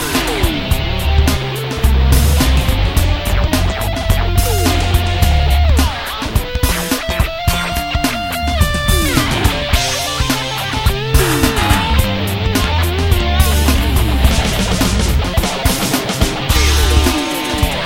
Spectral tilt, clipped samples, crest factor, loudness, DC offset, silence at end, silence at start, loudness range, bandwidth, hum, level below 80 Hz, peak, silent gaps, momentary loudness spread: -4.5 dB/octave; under 0.1%; 14 dB; -15 LUFS; 0.5%; 0 s; 0 s; 2 LU; 17 kHz; none; -16 dBFS; 0 dBFS; none; 5 LU